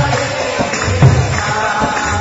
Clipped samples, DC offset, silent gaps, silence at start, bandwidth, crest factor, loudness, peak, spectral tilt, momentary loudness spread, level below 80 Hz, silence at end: under 0.1%; under 0.1%; none; 0 s; 8 kHz; 14 dB; -14 LUFS; 0 dBFS; -5 dB/octave; 6 LU; -28 dBFS; 0 s